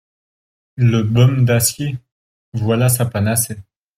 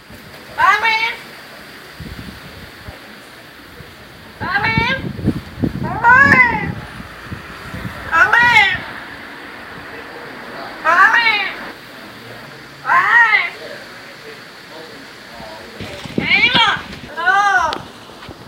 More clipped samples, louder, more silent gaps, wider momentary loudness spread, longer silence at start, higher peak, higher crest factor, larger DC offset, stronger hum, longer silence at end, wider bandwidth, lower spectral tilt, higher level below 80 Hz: neither; second, -16 LUFS vs -13 LUFS; first, 2.12-2.52 s vs none; second, 16 LU vs 25 LU; first, 0.75 s vs 0.1 s; about the same, -2 dBFS vs 0 dBFS; about the same, 14 dB vs 18 dB; neither; neither; first, 0.35 s vs 0 s; about the same, 16.5 kHz vs 16 kHz; first, -5.5 dB/octave vs -4 dB/octave; second, -50 dBFS vs -44 dBFS